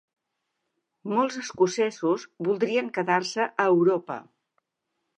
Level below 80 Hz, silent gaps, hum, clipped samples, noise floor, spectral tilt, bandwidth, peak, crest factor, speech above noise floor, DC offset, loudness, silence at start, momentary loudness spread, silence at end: -78 dBFS; none; none; under 0.1%; -81 dBFS; -5 dB/octave; 9.6 kHz; -8 dBFS; 20 dB; 56 dB; under 0.1%; -25 LUFS; 1.05 s; 8 LU; 0.95 s